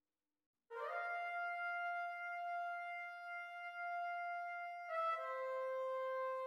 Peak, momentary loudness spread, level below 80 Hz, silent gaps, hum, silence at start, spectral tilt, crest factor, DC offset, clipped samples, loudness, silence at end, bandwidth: -30 dBFS; 6 LU; under -90 dBFS; none; none; 0.7 s; 1.5 dB/octave; 14 dB; under 0.1%; under 0.1%; -44 LUFS; 0 s; 15 kHz